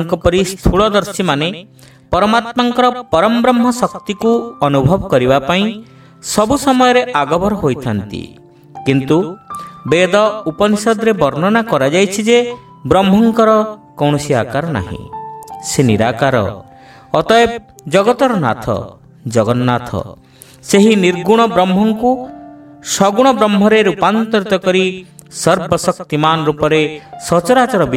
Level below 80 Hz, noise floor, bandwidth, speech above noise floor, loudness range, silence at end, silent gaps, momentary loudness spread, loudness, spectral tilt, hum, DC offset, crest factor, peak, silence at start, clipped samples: -38 dBFS; -35 dBFS; 16 kHz; 22 dB; 3 LU; 0 s; none; 13 LU; -13 LUFS; -5 dB/octave; none; under 0.1%; 14 dB; 0 dBFS; 0 s; under 0.1%